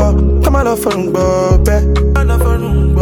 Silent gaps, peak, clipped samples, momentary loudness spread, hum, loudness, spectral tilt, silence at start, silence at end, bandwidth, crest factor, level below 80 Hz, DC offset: none; 0 dBFS; under 0.1%; 3 LU; none; -12 LUFS; -7 dB/octave; 0 s; 0 s; 17 kHz; 10 dB; -12 dBFS; under 0.1%